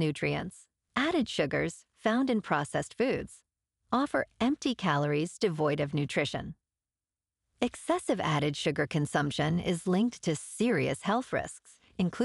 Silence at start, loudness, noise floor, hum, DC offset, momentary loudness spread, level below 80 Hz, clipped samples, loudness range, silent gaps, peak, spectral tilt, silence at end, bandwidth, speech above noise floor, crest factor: 0 s; -31 LUFS; under -90 dBFS; none; under 0.1%; 7 LU; -60 dBFS; under 0.1%; 3 LU; none; -14 dBFS; -5.5 dB/octave; 0 s; 12 kHz; over 60 dB; 18 dB